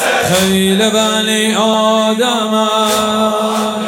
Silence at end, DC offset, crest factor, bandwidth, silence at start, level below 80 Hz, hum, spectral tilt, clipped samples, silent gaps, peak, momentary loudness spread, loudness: 0 s; under 0.1%; 12 dB; 18 kHz; 0 s; -48 dBFS; none; -3.5 dB/octave; under 0.1%; none; 0 dBFS; 2 LU; -12 LUFS